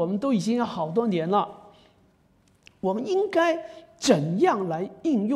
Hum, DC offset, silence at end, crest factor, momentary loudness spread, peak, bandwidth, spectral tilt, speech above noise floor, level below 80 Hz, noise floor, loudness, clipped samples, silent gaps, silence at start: none; under 0.1%; 0 s; 18 dB; 8 LU; -6 dBFS; 13 kHz; -5.5 dB/octave; 38 dB; -68 dBFS; -62 dBFS; -25 LUFS; under 0.1%; none; 0 s